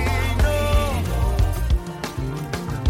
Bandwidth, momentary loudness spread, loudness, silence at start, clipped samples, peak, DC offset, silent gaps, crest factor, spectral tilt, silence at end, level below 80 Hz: 16.5 kHz; 8 LU; -23 LUFS; 0 s; under 0.1%; -8 dBFS; under 0.1%; none; 12 dB; -5.5 dB/octave; 0 s; -24 dBFS